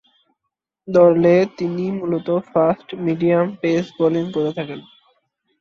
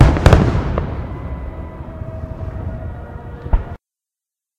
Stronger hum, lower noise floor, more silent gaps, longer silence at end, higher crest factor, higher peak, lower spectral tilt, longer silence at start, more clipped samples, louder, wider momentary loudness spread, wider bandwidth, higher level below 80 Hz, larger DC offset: neither; second, -79 dBFS vs -87 dBFS; neither; about the same, 0.8 s vs 0.85 s; about the same, 16 dB vs 18 dB; about the same, -2 dBFS vs 0 dBFS; about the same, -8 dB/octave vs -7.5 dB/octave; first, 0.85 s vs 0 s; second, under 0.1% vs 0.1%; about the same, -18 LUFS vs -20 LUFS; second, 10 LU vs 20 LU; second, 7 kHz vs 11 kHz; second, -60 dBFS vs -22 dBFS; neither